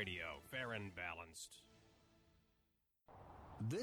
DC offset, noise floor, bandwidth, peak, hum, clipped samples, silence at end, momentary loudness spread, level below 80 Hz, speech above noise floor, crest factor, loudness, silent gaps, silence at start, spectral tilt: under 0.1%; -83 dBFS; over 20 kHz; -30 dBFS; none; under 0.1%; 0 s; 18 LU; -72 dBFS; 34 dB; 20 dB; -48 LUFS; none; 0 s; -4.5 dB/octave